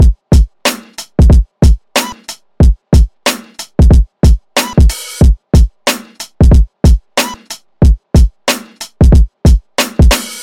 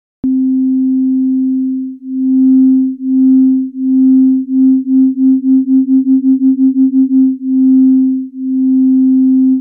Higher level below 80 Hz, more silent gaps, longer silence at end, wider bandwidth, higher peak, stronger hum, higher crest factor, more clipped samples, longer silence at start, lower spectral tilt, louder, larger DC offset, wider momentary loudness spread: first, -10 dBFS vs -60 dBFS; neither; about the same, 0 s vs 0 s; first, 17 kHz vs 0.8 kHz; first, 0 dBFS vs -4 dBFS; neither; about the same, 10 dB vs 6 dB; neither; second, 0 s vs 0.25 s; second, -5.5 dB/octave vs -13 dB/octave; about the same, -11 LUFS vs -11 LUFS; first, 0.4% vs under 0.1%; first, 11 LU vs 6 LU